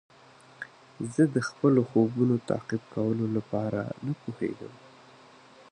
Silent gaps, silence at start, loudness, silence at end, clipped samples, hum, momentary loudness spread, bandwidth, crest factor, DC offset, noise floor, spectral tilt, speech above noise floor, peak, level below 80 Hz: none; 0.6 s; -28 LUFS; 0.95 s; under 0.1%; none; 19 LU; 10.5 kHz; 20 dB; under 0.1%; -55 dBFS; -8 dB/octave; 27 dB; -10 dBFS; -66 dBFS